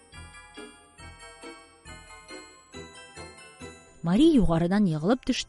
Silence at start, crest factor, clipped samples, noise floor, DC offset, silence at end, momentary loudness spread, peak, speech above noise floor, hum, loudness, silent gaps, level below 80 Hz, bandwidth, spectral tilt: 0.15 s; 18 dB; under 0.1%; -48 dBFS; under 0.1%; 0.05 s; 26 LU; -10 dBFS; 26 dB; none; -23 LUFS; none; -42 dBFS; 11.5 kHz; -6.5 dB/octave